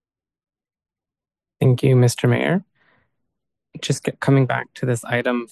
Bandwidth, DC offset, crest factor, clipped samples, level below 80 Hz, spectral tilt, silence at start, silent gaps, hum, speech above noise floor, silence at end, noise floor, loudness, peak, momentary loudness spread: 12.5 kHz; under 0.1%; 18 dB; under 0.1%; -58 dBFS; -6.5 dB/octave; 1.6 s; none; none; over 72 dB; 0.05 s; under -90 dBFS; -19 LUFS; -4 dBFS; 8 LU